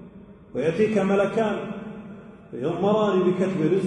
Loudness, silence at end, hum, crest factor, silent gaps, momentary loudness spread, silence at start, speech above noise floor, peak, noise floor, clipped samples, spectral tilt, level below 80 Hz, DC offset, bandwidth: -23 LUFS; 0 s; none; 14 dB; none; 18 LU; 0 s; 23 dB; -10 dBFS; -46 dBFS; under 0.1%; -7.5 dB/octave; -58 dBFS; under 0.1%; 10 kHz